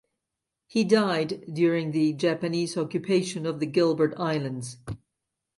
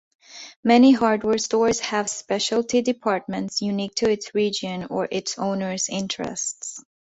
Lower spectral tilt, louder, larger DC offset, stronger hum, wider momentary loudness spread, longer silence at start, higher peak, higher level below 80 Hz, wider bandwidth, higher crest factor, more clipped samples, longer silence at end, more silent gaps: first, -6 dB/octave vs -3.5 dB/octave; second, -26 LUFS vs -22 LUFS; neither; neither; about the same, 12 LU vs 11 LU; first, 0.75 s vs 0.3 s; second, -8 dBFS vs -4 dBFS; about the same, -62 dBFS vs -60 dBFS; first, 11.5 kHz vs 8.2 kHz; about the same, 18 dB vs 18 dB; neither; first, 0.6 s vs 0.4 s; second, none vs 0.56-0.63 s